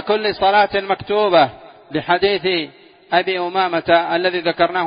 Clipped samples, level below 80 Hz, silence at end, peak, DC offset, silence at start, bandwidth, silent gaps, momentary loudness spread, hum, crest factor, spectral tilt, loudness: under 0.1%; -54 dBFS; 0 s; 0 dBFS; under 0.1%; 0 s; 5.2 kHz; none; 6 LU; none; 16 dB; -9.5 dB/octave; -17 LUFS